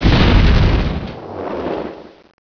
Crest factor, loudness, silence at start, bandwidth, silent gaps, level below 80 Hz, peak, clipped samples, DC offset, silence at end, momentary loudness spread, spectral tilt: 14 dB; -16 LUFS; 0 s; 5.4 kHz; none; -18 dBFS; -2 dBFS; under 0.1%; under 0.1%; 0.4 s; 16 LU; -7.5 dB/octave